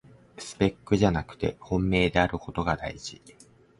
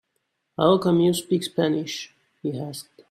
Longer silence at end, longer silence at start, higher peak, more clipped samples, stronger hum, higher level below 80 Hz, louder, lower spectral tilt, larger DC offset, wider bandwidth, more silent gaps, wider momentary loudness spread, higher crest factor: first, 0.5 s vs 0.3 s; second, 0.4 s vs 0.6 s; about the same, -6 dBFS vs -6 dBFS; neither; neither; first, -44 dBFS vs -64 dBFS; second, -27 LUFS vs -23 LUFS; about the same, -6 dB/octave vs -6 dB/octave; neither; second, 11.5 kHz vs 14.5 kHz; neither; about the same, 16 LU vs 18 LU; about the same, 22 dB vs 18 dB